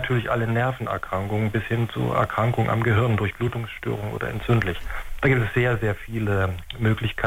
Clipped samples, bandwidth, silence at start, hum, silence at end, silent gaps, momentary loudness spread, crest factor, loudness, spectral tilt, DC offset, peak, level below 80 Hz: under 0.1%; 16 kHz; 0 s; none; 0 s; none; 8 LU; 16 dB; -24 LUFS; -7.5 dB/octave; under 0.1%; -8 dBFS; -40 dBFS